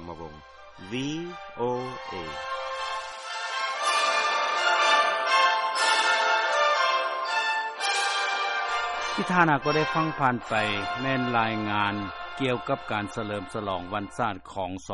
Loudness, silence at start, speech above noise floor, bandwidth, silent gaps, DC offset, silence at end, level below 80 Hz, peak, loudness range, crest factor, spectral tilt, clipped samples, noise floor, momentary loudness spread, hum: -26 LUFS; 0 s; 19 dB; 11 kHz; none; under 0.1%; 0 s; -60 dBFS; -6 dBFS; 8 LU; 22 dB; -3.5 dB/octave; under 0.1%; -47 dBFS; 12 LU; none